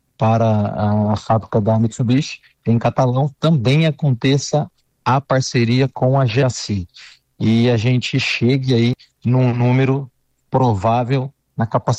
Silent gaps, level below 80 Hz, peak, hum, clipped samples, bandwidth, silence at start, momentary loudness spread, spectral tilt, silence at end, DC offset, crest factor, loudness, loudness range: none; -50 dBFS; -6 dBFS; none; under 0.1%; 8.6 kHz; 0.2 s; 8 LU; -6.5 dB/octave; 0 s; under 0.1%; 12 dB; -17 LUFS; 1 LU